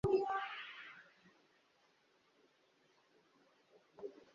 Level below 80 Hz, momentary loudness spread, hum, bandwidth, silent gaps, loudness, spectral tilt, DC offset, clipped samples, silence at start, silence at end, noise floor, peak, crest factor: -68 dBFS; 19 LU; none; 7.2 kHz; none; -42 LUFS; -4.5 dB/octave; under 0.1%; under 0.1%; 0.05 s; 0.2 s; -75 dBFS; -24 dBFS; 22 dB